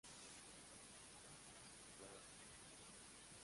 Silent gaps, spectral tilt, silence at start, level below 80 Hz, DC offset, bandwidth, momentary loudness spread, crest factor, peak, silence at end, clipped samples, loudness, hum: none; -2 dB/octave; 0.05 s; -78 dBFS; under 0.1%; 11.5 kHz; 1 LU; 16 dB; -44 dBFS; 0 s; under 0.1%; -59 LUFS; none